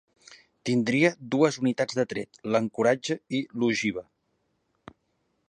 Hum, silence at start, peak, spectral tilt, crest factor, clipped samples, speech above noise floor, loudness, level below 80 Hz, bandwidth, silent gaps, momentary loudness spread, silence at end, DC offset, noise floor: none; 0.3 s; -6 dBFS; -5.5 dB/octave; 22 dB; under 0.1%; 48 dB; -26 LUFS; -68 dBFS; 10.5 kHz; none; 8 LU; 1.45 s; under 0.1%; -74 dBFS